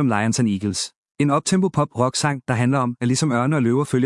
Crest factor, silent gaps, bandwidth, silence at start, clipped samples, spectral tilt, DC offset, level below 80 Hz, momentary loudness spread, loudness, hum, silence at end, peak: 16 dB; 0.96-1.05 s, 1.11-1.15 s; 12 kHz; 0 s; under 0.1%; -5.5 dB/octave; under 0.1%; -60 dBFS; 4 LU; -20 LUFS; none; 0 s; -4 dBFS